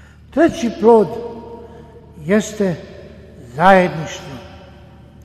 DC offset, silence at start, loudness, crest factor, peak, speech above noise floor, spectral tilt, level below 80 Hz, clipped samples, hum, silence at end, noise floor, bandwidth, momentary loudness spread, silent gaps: under 0.1%; 0.35 s; -15 LUFS; 18 dB; 0 dBFS; 27 dB; -6 dB/octave; -44 dBFS; under 0.1%; none; 0.65 s; -41 dBFS; 13 kHz; 23 LU; none